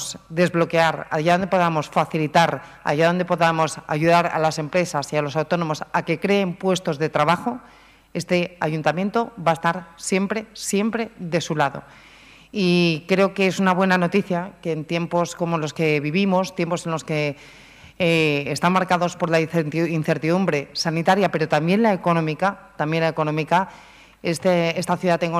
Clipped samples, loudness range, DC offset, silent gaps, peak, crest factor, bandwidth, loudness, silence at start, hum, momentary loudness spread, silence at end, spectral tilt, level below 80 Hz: under 0.1%; 3 LU; under 0.1%; none; 0 dBFS; 22 dB; 15 kHz; -21 LUFS; 0 s; none; 7 LU; 0 s; -5.5 dB/octave; -58 dBFS